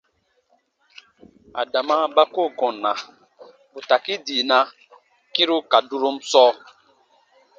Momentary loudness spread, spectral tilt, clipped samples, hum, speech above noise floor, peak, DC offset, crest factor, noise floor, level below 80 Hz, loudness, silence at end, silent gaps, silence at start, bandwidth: 15 LU; -1.5 dB/octave; under 0.1%; none; 46 dB; 0 dBFS; under 0.1%; 22 dB; -66 dBFS; -76 dBFS; -20 LUFS; 1 s; none; 1.55 s; 7.8 kHz